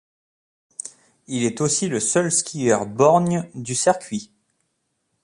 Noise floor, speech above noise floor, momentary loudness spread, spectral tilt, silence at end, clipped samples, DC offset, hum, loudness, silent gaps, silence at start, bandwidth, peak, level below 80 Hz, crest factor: -73 dBFS; 53 dB; 18 LU; -4 dB/octave; 1 s; under 0.1%; under 0.1%; none; -20 LUFS; none; 0.85 s; 11.5 kHz; -4 dBFS; -62 dBFS; 20 dB